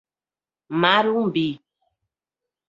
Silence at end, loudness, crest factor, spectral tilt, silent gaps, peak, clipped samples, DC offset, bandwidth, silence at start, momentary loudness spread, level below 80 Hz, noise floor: 1.15 s; -21 LUFS; 22 dB; -7 dB/octave; none; -2 dBFS; under 0.1%; under 0.1%; 7.4 kHz; 0.7 s; 12 LU; -68 dBFS; under -90 dBFS